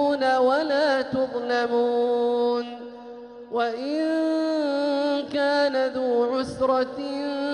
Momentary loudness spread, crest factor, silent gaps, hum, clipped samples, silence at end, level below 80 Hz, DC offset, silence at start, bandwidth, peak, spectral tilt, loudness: 8 LU; 12 dB; none; none; under 0.1%; 0 s; -62 dBFS; under 0.1%; 0 s; 10.5 kHz; -10 dBFS; -5 dB/octave; -24 LUFS